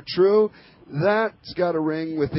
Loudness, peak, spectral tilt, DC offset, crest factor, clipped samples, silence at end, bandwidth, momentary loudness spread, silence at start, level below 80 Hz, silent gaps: -22 LUFS; -8 dBFS; -10.5 dB/octave; under 0.1%; 14 dB; under 0.1%; 0 s; 5.8 kHz; 8 LU; 0.05 s; -54 dBFS; none